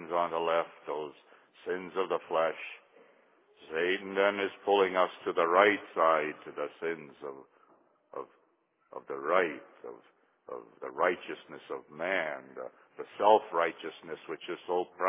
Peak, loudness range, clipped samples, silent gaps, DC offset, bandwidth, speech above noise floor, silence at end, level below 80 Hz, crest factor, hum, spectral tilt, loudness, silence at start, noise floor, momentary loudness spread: -8 dBFS; 9 LU; under 0.1%; none; under 0.1%; 3.9 kHz; 41 dB; 0 s; -82 dBFS; 24 dB; none; -1.5 dB/octave; -31 LUFS; 0 s; -72 dBFS; 20 LU